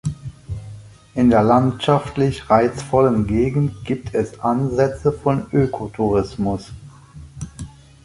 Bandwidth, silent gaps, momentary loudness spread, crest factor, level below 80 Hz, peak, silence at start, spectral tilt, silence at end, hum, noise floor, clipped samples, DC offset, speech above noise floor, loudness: 11.5 kHz; none; 18 LU; 18 dB; -40 dBFS; 0 dBFS; 0.05 s; -7.5 dB/octave; 0.4 s; none; -40 dBFS; under 0.1%; under 0.1%; 23 dB; -19 LUFS